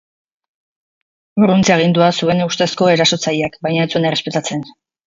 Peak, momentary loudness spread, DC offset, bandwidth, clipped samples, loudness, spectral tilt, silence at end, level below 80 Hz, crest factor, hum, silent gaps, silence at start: 0 dBFS; 9 LU; under 0.1%; 7.8 kHz; under 0.1%; -15 LUFS; -5 dB/octave; 0.35 s; -54 dBFS; 16 dB; none; none; 1.35 s